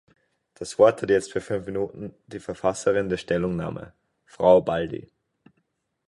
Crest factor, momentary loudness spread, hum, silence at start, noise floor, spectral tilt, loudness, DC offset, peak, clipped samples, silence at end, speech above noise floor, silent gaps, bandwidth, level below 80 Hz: 20 dB; 19 LU; none; 0.6 s; -74 dBFS; -6 dB/octave; -24 LUFS; under 0.1%; -4 dBFS; under 0.1%; 1.1 s; 50 dB; none; 11.5 kHz; -54 dBFS